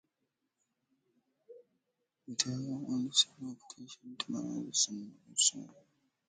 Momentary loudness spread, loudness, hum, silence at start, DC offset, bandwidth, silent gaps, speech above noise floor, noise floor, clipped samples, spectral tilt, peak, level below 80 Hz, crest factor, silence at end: 21 LU; -33 LUFS; none; 1.5 s; under 0.1%; 9.4 kHz; none; 49 dB; -85 dBFS; under 0.1%; -1.5 dB/octave; -14 dBFS; -84 dBFS; 26 dB; 0.55 s